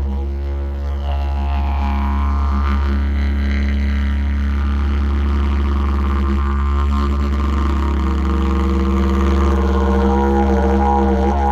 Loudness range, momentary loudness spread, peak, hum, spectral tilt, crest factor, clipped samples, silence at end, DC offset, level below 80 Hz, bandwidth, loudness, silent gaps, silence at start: 3 LU; 5 LU; -4 dBFS; none; -8.5 dB/octave; 12 dB; under 0.1%; 0 s; under 0.1%; -18 dBFS; 7 kHz; -18 LUFS; none; 0 s